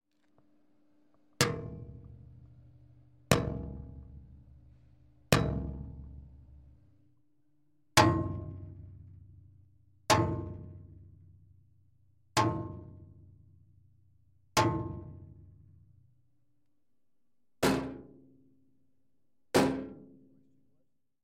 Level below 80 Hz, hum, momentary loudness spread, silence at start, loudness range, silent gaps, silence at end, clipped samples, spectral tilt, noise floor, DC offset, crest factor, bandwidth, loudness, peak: -52 dBFS; none; 25 LU; 1.4 s; 7 LU; none; 1.2 s; under 0.1%; -4.5 dB/octave; -84 dBFS; under 0.1%; 32 dB; 13.5 kHz; -31 LUFS; -6 dBFS